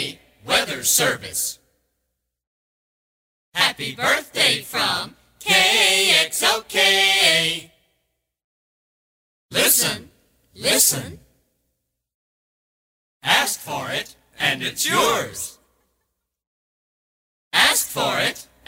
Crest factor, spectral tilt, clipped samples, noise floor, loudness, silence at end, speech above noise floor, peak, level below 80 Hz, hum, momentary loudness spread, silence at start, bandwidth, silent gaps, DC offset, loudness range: 20 dB; -0.5 dB/octave; under 0.1%; -77 dBFS; -18 LUFS; 0.25 s; 57 dB; -2 dBFS; -58 dBFS; none; 15 LU; 0 s; over 20 kHz; 2.47-3.52 s, 8.44-9.49 s, 12.14-13.20 s, 16.47-17.51 s; under 0.1%; 8 LU